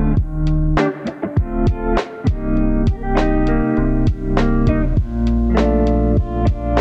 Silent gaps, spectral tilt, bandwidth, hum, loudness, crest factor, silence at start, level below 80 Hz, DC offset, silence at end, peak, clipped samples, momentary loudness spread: none; -9 dB/octave; 7.4 kHz; none; -18 LUFS; 14 dB; 0 s; -20 dBFS; under 0.1%; 0 s; -2 dBFS; under 0.1%; 5 LU